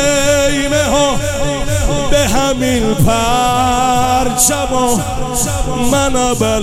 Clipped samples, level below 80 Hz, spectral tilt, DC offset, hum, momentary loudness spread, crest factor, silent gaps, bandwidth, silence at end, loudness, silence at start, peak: under 0.1%; -24 dBFS; -4 dB/octave; under 0.1%; none; 5 LU; 12 dB; none; 16.5 kHz; 0 s; -13 LUFS; 0 s; 0 dBFS